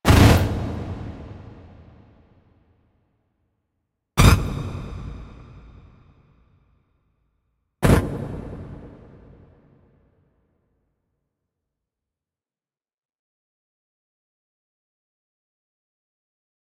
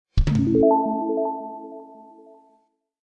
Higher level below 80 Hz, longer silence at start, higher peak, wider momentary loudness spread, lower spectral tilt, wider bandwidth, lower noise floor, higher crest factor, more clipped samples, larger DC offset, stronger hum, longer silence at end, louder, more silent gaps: about the same, -32 dBFS vs -32 dBFS; about the same, 0.05 s vs 0.15 s; first, -2 dBFS vs -6 dBFS; first, 26 LU vs 21 LU; second, -6 dB/octave vs -9 dB/octave; first, 16 kHz vs 8 kHz; first, under -90 dBFS vs -65 dBFS; first, 24 dB vs 18 dB; neither; neither; neither; first, 7.8 s vs 1.1 s; about the same, -20 LUFS vs -21 LUFS; neither